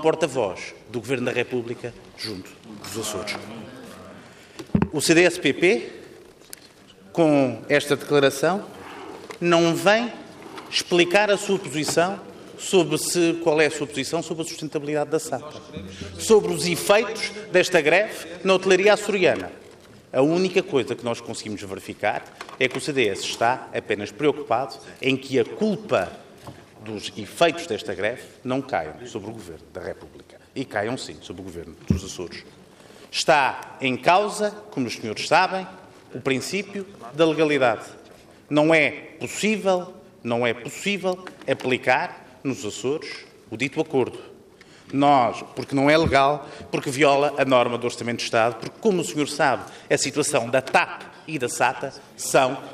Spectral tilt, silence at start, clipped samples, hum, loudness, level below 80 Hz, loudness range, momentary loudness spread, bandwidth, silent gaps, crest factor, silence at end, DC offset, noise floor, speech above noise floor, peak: -4 dB/octave; 0 s; under 0.1%; none; -22 LUFS; -58 dBFS; 7 LU; 19 LU; 15 kHz; none; 18 dB; 0 s; under 0.1%; -49 dBFS; 27 dB; -4 dBFS